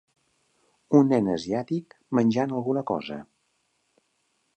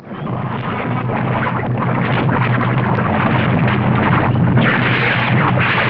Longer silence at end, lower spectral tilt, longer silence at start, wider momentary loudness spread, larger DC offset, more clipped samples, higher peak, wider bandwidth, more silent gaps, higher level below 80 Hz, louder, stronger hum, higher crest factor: first, 1.35 s vs 0 s; second, -7.5 dB/octave vs -9.5 dB/octave; first, 0.9 s vs 0 s; first, 12 LU vs 7 LU; neither; neither; second, -6 dBFS vs -2 dBFS; first, 8.8 kHz vs 5.4 kHz; neither; second, -66 dBFS vs -40 dBFS; second, -25 LUFS vs -16 LUFS; neither; first, 22 dB vs 14 dB